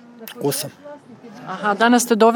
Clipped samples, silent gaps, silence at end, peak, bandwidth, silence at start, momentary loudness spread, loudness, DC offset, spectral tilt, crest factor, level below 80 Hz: under 0.1%; none; 0 s; 0 dBFS; over 20 kHz; 0.2 s; 25 LU; -18 LUFS; under 0.1%; -3.5 dB/octave; 18 dB; -74 dBFS